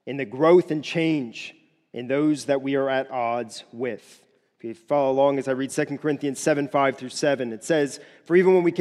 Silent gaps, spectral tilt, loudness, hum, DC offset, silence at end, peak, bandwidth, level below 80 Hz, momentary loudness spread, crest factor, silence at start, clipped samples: none; -5.5 dB/octave; -23 LUFS; none; under 0.1%; 0 s; -6 dBFS; 12.5 kHz; -76 dBFS; 19 LU; 18 dB; 0.05 s; under 0.1%